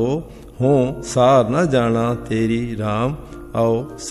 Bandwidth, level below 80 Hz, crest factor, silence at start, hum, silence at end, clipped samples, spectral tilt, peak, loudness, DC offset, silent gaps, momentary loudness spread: 13.5 kHz; -42 dBFS; 14 dB; 0 s; none; 0 s; under 0.1%; -6.5 dB/octave; -4 dBFS; -19 LUFS; under 0.1%; none; 11 LU